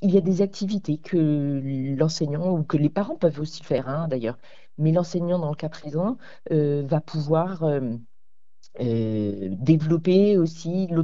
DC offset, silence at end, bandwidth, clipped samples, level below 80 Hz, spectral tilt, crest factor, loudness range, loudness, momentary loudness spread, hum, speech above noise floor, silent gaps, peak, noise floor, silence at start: 0.9%; 0 s; 7.6 kHz; under 0.1%; -58 dBFS; -8 dB/octave; 18 dB; 3 LU; -24 LUFS; 9 LU; none; 56 dB; none; -6 dBFS; -79 dBFS; 0 s